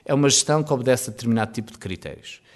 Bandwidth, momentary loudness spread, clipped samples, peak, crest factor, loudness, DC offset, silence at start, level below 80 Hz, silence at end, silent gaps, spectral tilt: 12 kHz; 17 LU; under 0.1%; -6 dBFS; 16 dB; -20 LUFS; under 0.1%; 0.1 s; -56 dBFS; 0.2 s; none; -4 dB/octave